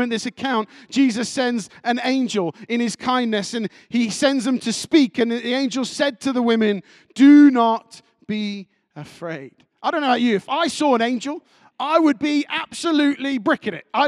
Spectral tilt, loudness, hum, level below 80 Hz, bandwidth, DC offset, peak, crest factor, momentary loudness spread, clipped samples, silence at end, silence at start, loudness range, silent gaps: -4 dB/octave; -20 LUFS; none; -68 dBFS; 11.5 kHz; under 0.1%; -4 dBFS; 16 dB; 12 LU; under 0.1%; 0 s; 0 s; 5 LU; none